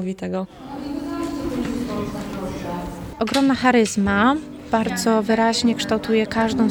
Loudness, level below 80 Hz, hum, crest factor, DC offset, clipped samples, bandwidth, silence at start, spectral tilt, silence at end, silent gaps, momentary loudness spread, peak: -21 LUFS; -44 dBFS; none; 18 dB; under 0.1%; under 0.1%; 19 kHz; 0 s; -5 dB/octave; 0 s; none; 12 LU; -4 dBFS